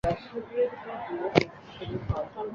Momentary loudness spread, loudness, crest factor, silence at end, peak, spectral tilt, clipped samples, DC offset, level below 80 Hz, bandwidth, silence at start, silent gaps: 11 LU; -31 LUFS; 28 dB; 0 s; -2 dBFS; -7 dB/octave; under 0.1%; under 0.1%; -46 dBFS; 8.4 kHz; 0.05 s; none